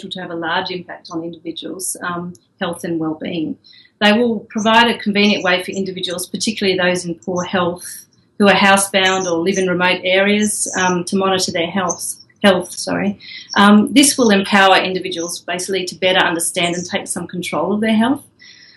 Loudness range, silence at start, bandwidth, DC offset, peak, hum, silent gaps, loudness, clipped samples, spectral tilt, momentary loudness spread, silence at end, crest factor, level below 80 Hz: 7 LU; 0 s; 12.5 kHz; under 0.1%; 0 dBFS; none; none; -16 LUFS; under 0.1%; -3.5 dB/octave; 14 LU; 0.3 s; 16 dB; -58 dBFS